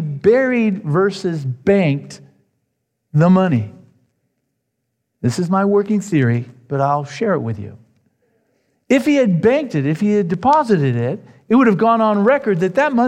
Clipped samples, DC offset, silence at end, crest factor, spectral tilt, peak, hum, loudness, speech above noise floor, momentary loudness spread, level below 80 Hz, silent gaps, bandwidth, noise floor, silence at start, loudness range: under 0.1%; under 0.1%; 0 s; 14 dB; -7.5 dB/octave; -2 dBFS; none; -16 LUFS; 58 dB; 9 LU; -60 dBFS; none; 10.5 kHz; -73 dBFS; 0 s; 5 LU